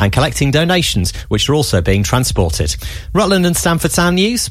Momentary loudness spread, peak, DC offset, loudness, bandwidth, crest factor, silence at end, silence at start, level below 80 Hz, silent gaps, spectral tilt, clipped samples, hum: 6 LU; 0 dBFS; under 0.1%; -14 LUFS; 16 kHz; 14 dB; 0 s; 0 s; -26 dBFS; none; -4.5 dB/octave; under 0.1%; none